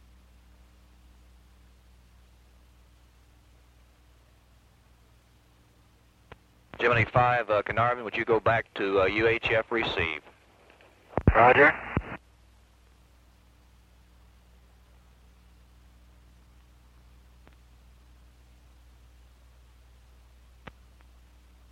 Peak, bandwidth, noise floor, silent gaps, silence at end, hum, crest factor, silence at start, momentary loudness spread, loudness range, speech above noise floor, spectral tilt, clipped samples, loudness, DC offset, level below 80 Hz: -6 dBFS; 12.5 kHz; -60 dBFS; none; 9.55 s; 60 Hz at -55 dBFS; 24 dB; 6.75 s; 24 LU; 6 LU; 36 dB; -7 dB/octave; under 0.1%; -24 LUFS; under 0.1%; -46 dBFS